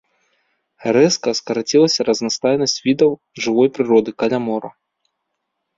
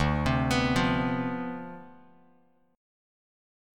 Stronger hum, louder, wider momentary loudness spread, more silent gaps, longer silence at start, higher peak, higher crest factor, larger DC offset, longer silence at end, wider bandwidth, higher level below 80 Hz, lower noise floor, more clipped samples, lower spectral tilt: neither; first, -17 LUFS vs -27 LUFS; second, 9 LU vs 16 LU; neither; first, 0.8 s vs 0 s; first, -2 dBFS vs -12 dBFS; about the same, 16 dB vs 18 dB; neither; about the same, 1.05 s vs 0.95 s; second, 7.8 kHz vs 15.5 kHz; second, -60 dBFS vs -42 dBFS; first, -75 dBFS vs -65 dBFS; neither; second, -4 dB/octave vs -6 dB/octave